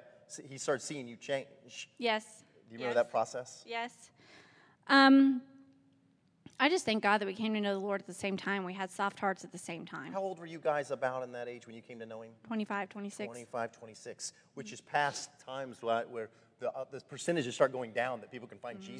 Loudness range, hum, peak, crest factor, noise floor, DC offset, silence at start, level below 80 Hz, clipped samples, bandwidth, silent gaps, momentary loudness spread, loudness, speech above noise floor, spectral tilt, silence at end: 10 LU; none; -12 dBFS; 22 dB; -70 dBFS; under 0.1%; 0.05 s; -84 dBFS; under 0.1%; 10.5 kHz; none; 17 LU; -34 LUFS; 35 dB; -4 dB/octave; 0 s